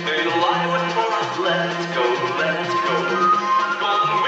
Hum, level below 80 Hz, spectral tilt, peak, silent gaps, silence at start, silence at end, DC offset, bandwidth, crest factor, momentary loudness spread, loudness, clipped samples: none; -74 dBFS; -4.5 dB/octave; -6 dBFS; none; 0 s; 0 s; under 0.1%; 8.4 kHz; 14 dB; 4 LU; -20 LUFS; under 0.1%